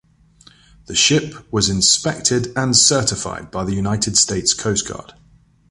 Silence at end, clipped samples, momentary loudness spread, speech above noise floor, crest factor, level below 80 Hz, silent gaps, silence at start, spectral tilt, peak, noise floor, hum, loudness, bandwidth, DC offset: 0.7 s; under 0.1%; 13 LU; 34 dB; 20 dB; -44 dBFS; none; 0.9 s; -2.5 dB/octave; 0 dBFS; -52 dBFS; none; -16 LUFS; 11.5 kHz; under 0.1%